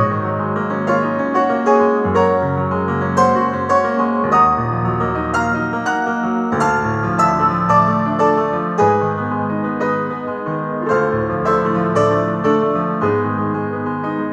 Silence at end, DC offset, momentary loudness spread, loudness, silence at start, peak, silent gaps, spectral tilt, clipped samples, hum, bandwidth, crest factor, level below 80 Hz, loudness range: 0 s; under 0.1%; 7 LU; -17 LUFS; 0 s; 0 dBFS; none; -7.5 dB/octave; under 0.1%; none; 10 kHz; 16 dB; -44 dBFS; 2 LU